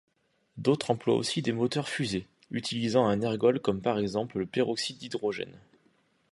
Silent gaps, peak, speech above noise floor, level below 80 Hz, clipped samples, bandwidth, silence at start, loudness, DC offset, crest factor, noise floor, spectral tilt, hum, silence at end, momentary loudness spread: none; -10 dBFS; 40 dB; -62 dBFS; under 0.1%; 11.5 kHz; 0.55 s; -29 LUFS; under 0.1%; 20 dB; -68 dBFS; -5.5 dB/octave; none; 0.75 s; 8 LU